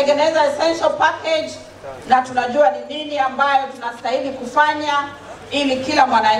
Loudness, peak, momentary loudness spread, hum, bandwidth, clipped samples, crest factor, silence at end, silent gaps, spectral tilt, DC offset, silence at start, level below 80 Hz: -18 LUFS; 0 dBFS; 12 LU; none; 11.5 kHz; under 0.1%; 18 dB; 0 s; none; -3 dB/octave; under 0.1%; 0 s; -56 dBFS